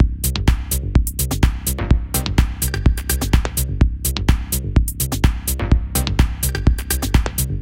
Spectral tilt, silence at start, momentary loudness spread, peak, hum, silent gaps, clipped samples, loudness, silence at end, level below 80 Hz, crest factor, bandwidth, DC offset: -4.5 dB/octave; 0 s; 2 LU; 0 dBFS; none; none; under 0.1%; -19 LUFS; 0 s; -20 dBFS; 18 dB; 17 kHz; under 0.1%